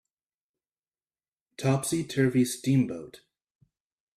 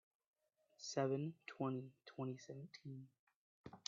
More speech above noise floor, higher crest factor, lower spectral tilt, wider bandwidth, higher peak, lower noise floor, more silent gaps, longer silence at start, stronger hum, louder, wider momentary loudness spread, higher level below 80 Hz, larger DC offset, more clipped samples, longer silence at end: first, over 64 dB vs 24 dB; second, 18 dB vs 24 dB; about the same, -6 dB/octave vs -6 dB/octave; first, 15 kHz vs 7.4 kHz; first, -12 dBFS vs -24 dBFS; first, under -90 dBFS vs -69 dBFS; second, none vs 3.19-3.27 s, 3.36-3.64 s; first, 1.6 s vs 0.8 s; neither; first, -27 LUFS vs -47 LUFS; second, 10 LU vs 18 LU; first, -68 dBFS vs -88 dBFS; neither; neither; first, 1 s vs 0.1 s